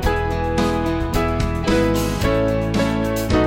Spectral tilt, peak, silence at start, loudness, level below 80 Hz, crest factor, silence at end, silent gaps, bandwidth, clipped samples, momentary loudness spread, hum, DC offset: -6 dB/octave; -4 dBFS; 0 s; -20 LUFS; -26 dBFS; 14 dB; 0 s; none; 17 kHz; under 0.1%; 3 LU; none; under 0.1%